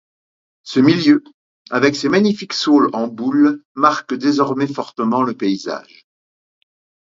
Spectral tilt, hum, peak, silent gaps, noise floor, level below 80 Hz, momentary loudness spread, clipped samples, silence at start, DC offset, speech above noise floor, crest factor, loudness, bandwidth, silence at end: -5.5 dB/octave; none; 0 dBFS; 1.34-1.65 s, 3.65-3.75 s; under -90 dBFS; -64 dBFS; 8 LU; under 0.1%; 0.65 s; under 0.1%; over 74 dB; 18 dB; -16 LUFS; 7.6 kHz; 1.3 s